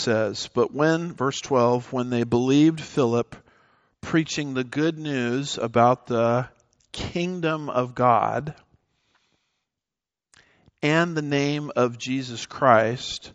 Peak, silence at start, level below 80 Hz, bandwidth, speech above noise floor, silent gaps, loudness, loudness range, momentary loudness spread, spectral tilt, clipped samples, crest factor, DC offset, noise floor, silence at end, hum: -2 dBFS; 0 s; -58 dBFS; 8.2 kHz; 67 dB; none; -23 LUFS; 5 LU; 9 LU; -5.5 dB/octave; under 0.1%; 22 dB; under 0.1%; -90 dBFS; 0.05 s; none